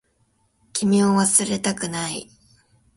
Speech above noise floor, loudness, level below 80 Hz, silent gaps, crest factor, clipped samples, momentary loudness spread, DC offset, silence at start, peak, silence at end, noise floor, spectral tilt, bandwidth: 45 dB; -20 LUFS; -60 dBFS; none; 20 dB; under 0.1%; 13 LU; under 0.1%; 0.75 s; -2 dBFS; 0.75 s; -66 dBFS; -4 dB/octave; 11.5 kHz